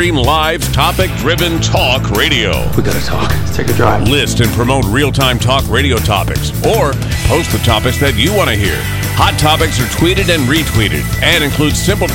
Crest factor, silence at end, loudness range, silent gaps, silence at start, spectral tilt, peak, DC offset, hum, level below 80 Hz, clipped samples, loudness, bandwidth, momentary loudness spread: 12 dB; 0 s; 1 LU; none; 0 s; -4.5 dB/octave; 0 dBFS; under 0.1%; none; -22 dBFS; under 0.1%; -12 LUFS; 17 kHz; 4 LU